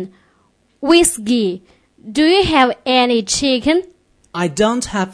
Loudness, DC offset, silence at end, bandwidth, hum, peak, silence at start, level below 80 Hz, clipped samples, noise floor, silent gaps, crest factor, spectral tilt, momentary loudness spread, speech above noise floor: -15 LUFS; under 0.1%; 0 s; 11 kHz; none; 0 dBFS; 0 s; -42 dBFS; under 0.1%; -58 dBFS; none; 16 dB; -3.5 dB/octave; 12 LU; 44 dB